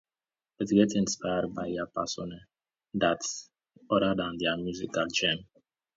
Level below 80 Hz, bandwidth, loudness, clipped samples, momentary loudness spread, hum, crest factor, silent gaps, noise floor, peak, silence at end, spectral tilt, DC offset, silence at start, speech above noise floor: -60 dBFS; 7.8 kHz; -29 LUFS; under 0.1%; 12 LU; none; 20 dB; none; under -90 dBFS; -10 dBFS; 0.55 s; -4 dB/octave; under 0.1%; 0.6 s; over 61 dB